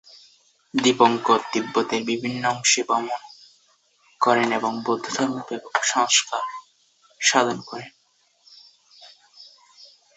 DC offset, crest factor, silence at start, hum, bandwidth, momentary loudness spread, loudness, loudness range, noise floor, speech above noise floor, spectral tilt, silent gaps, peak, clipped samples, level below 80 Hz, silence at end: under 0.1%; 22 dB; 0.75 s; none; 8.4 kHz; 14 LU; -22 LUFS; 5 LU; -63 dBFS; 41 dB; -2 dB/octave; none; -2 dBFS; under 0.1%; -70 dBFS; 0.3 s